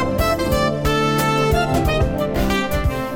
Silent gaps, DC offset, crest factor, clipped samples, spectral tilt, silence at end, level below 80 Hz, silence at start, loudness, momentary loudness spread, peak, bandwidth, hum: none; 0.6%; 12 dB; under 0.1%; -5.5 dB/octave; 0 s; -26 dBFS; 0 s; -19 LUFS; 3 LU; -6 dBFS; 17 kHz; none